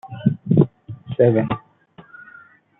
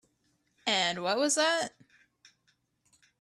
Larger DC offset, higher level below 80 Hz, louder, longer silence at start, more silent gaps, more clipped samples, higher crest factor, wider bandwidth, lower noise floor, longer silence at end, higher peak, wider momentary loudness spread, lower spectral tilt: neither; first, -54 dBFS vs -78 dBFS; first, -20 LUFS vs -28 LUFS; second, 0.05 s vs 0.65 s; neither; neither; about the same, 20 dB vs 20 dB; second, 4 kHz vs 13 kHz; second, -49 dBFS vs -74 dBFS; second, 1.2 s vs 1.55 s; first, -2 dBFS vs -14 dBFS; first, 13 LU vs 9 LU; first, -12.5 dB/octave vs -1.5 dB/octave